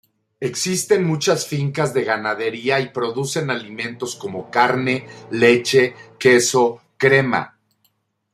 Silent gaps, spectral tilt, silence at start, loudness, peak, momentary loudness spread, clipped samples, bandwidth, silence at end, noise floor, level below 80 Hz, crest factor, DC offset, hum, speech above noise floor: none; -4 dB/octave; 0.4 s; -19 LUFS; -2 dBFS; 12 LU; under 0.1%; 15 kHz; 0.85 s; -66 dBFS; -64 dBFS; 18 dB; under 0.1%; none; 48 dB